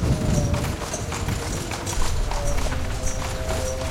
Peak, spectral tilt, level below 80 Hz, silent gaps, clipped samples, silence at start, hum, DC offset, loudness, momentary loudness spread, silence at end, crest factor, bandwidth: -8 dBFS; -4.5 dB/octave; -28 dBFS; none; under 0.1%; 0 s; none; under 0.1%; -26 LUFS; 5 LU; 0 s; 16 dB; 16.5 kHz